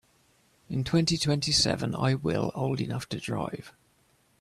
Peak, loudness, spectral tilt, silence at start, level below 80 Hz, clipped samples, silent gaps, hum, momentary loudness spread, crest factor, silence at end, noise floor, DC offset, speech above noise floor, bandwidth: -12 dBFS; -28 LUFS; -4.5 dB/octave; 0.7 s; -54 dBFS; under 0.1%; none; none; 10 LU; 18 dB; 0.7 s; -66 dBFS; under 0.1%; 38 dB; 14 kHz